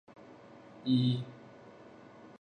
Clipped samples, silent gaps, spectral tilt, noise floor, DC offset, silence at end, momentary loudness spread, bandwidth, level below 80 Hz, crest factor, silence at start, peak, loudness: under 0.1%; none; -8.5 dB/octave; -54 dBFS; under 0.1%; 0.15 s; 25 LU; 9 kHz; -76 dBFS; 18 dB; 0.3 s; -18 dBFS; -32 LUFS